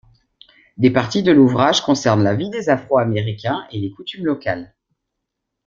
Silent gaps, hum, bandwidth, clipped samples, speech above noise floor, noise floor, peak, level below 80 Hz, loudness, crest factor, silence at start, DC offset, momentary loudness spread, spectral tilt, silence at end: none; none; 7.6 kHz; under 0.1%; 62 dB; -78 dBFS; -2 dBFS; -54 dBFS; -17 LUFS; 16 dB; 0.8 s; under 0.1%; 12 LU; -6 dB/octave; 1 s